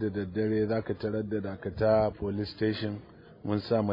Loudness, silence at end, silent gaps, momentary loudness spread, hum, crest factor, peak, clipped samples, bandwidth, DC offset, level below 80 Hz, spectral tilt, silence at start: -30 LUFS; 0 s; none; 10 LU; none; 18 dB; -12 dBFS; under 0.1%; 5.4 kHz; under 0.1%; -56 dBFS; -10 dB/octave; 0 s